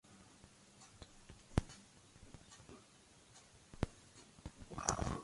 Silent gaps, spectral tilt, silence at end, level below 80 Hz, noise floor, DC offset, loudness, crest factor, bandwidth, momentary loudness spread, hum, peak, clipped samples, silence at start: none; -4.5 dB/octave; 0 s; -54 dBFS; -65 dBFS; under 0.1%; -44 LUFS; 34 dB; 11.5 kHz; 22 LU; none; -14 dBFS; under 0.1%; 0.05 s